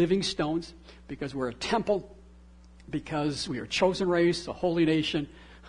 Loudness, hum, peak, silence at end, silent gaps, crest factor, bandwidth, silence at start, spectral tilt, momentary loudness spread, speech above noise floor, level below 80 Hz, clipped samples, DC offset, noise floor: -29 LUFS; none; -10 dBFS; 0 s; none; 18 dB; 11 kHz; 0 s; -5.5 dB/octave; 12 LU; 24 dB; -52 dBFS; under 0.1%; under 0.1%; -52 dBFS